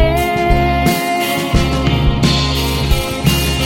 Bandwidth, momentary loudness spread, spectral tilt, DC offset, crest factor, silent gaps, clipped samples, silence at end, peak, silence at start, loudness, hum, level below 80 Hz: 17 kHz; 3 LU; -5 dB/octave; under 0.1%; 12 dB; none; under 0.1%; 0 s; 0 dBFS; 0 s; -15 LUFS; none; -20 dBFS